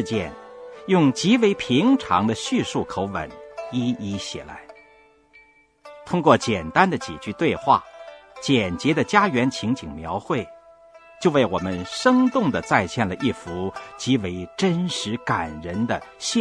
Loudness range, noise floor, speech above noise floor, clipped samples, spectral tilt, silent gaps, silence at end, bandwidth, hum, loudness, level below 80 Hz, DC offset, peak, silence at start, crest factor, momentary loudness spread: 5 LU; -55 dBFS; 33 dB; under 0.1%; -5 dB/octave; none; 0 s; 10.5 kHz; none; -22 LUFS; -52 dBFS; under 0.1%; 0 dBFS; 0 s; 22 dB; 14 LU